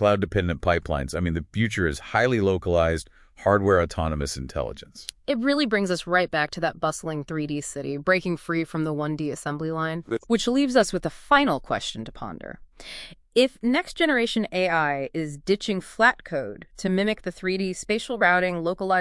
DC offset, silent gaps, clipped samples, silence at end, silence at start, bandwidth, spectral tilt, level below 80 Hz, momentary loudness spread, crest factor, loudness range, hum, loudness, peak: under 0.1%; none; under 0.1%; 0 s; 0 s; 12 kHz; -5 dB/octave; -46 dBFS; 11 LU; 20 dB; 2 LU; none; -24 LUFS; -4 dBFS